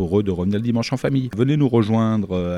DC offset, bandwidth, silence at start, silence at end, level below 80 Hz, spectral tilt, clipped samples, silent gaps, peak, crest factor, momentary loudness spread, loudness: under 0.1%; 11.5 kHz; 0 s; 0 s; -46 dBFS; -8 dB/octave; under 0.1%; none; -6 dBFS; 14 dB; 4 LU; -20 LUFS